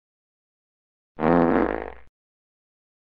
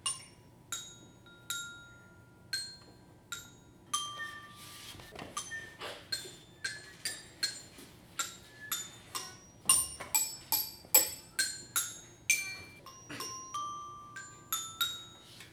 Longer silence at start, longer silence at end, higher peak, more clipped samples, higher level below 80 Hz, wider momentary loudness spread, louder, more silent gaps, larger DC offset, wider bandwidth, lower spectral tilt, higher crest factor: first, 1.2 s vs 0 s; first, 1.15 s vs 0 s; first, -4 dBFS vs -10 dBFS; neither; first, -46 dBFS vs -68 dBFS; second, 14 LU vs 20 LU; first, -22 LUFS vs -34 LUFS; neither; neither; second, 5.2 kHz vs over 20 kHz; first, -10 dB/octave vs 0.5 dB/octave; about the same, 24 dB vs 28 dB